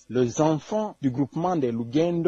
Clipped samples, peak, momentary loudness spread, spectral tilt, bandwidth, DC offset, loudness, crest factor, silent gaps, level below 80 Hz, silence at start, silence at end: under 0.1%; -8 dBFS; 4 LU; -7 dB/octave; 7.8 kHz; under 0.1%; -25 LUFS; 16 dB; none; -60 dBFS; 0.1 s; 0 s